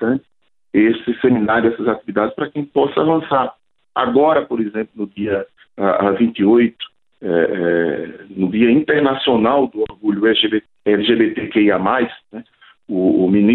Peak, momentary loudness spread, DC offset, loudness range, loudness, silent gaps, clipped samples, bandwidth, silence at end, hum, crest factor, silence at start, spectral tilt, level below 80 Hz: -2 dBFS; 11 LU; under 0.1%; 2 LU; -17 LUFS; none; under 0.1%; 4.2 kHz; 0 s; none; 16 dB; 0 s; -10 dB/octave; -54 dBFS